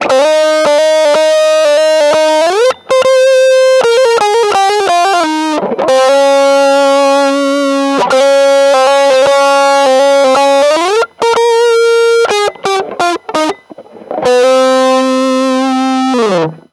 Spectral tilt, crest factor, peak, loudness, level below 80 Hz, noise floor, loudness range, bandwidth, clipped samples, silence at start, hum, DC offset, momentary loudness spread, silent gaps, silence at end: -2.5 dB/octave; 8 dB; 0 dBFS; -9 LUFS; -58 dBFS; -32 dBFS; 3 LU; 13 kHz; under 0.1%; 0 s; none; under 0.1%; 5 LU; none; 0.15 s